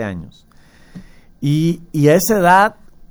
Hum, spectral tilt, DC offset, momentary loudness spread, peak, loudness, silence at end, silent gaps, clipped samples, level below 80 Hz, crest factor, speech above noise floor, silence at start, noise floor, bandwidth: none; -5.5 dB/octave; under 0.1%; 13 LU; 0 dBFS; -14 LUFS; 0.4 s; none; under 0.1%; -44 dBFS; 16 dB; 26 dB; 0 s; -40 dBFS; over 20 kHz